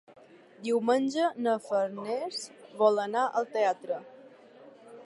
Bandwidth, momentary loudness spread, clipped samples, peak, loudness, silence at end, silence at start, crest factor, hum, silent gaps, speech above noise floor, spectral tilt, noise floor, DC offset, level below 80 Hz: 11.5 kHz; 12 LU; under 0.1%; -10 dBFS; -29 LUFS; 0 s; 0.1 s; 20 dB; none; none; 25 dB; -4.5 dB/octave; -53 dBFS; under 0.1%; -86 dBFS